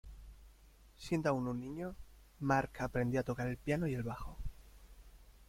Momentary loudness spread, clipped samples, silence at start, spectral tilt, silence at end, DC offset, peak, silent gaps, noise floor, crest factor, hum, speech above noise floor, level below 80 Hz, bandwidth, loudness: 18 LU; under 0.1%; 0.05 s; -7 dB/octave; 0.05 s; under 0.1%; -18 dBFS; none; -62 dBFS; 22 dB; none; 25 dB; -54 dBFS; 16.5 kHz; -38 LUFS